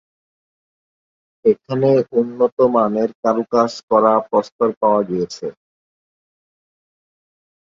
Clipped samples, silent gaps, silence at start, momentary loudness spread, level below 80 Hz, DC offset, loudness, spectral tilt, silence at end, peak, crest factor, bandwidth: under 0.1%; 2.52-2.57 s, 3.15-3.23 s, 3.83-3.88 s, 4.52-4.59 s, 4.77-4.81 s; 1.45 s; 7 LU; -62 dBFS; under 0.1%; -17 LUFS; -7 dB/octave; 2.25 s; -2 dBFS; 18 dB; 7.6 kHz